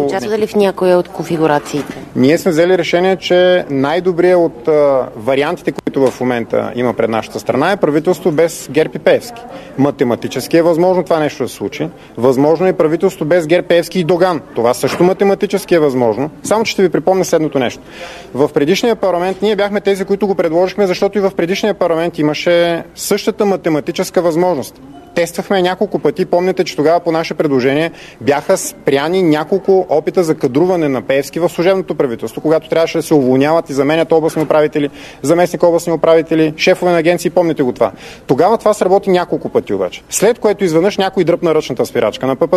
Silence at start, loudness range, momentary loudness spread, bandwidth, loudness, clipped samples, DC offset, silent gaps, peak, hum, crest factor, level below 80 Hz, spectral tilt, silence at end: 0 s; 2 LU; 6 LU; 13.5 kHz; -14 LUFS; under 0.1%; under 0.1%; none; 0 dBFS; none; 14 dB; -50 dBFS; -5.5 dB/octave; 0 s